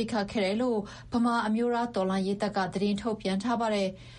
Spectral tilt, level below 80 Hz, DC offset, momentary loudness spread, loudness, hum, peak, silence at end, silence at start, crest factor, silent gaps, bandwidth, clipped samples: -6 dB/octave; -56 dBFS; under 0.1%; 4 LU; -29 LUFS; none; -16 dBFS; 0 s; 0 s; 12 dB; none; 10.5 kHz; under 0.1%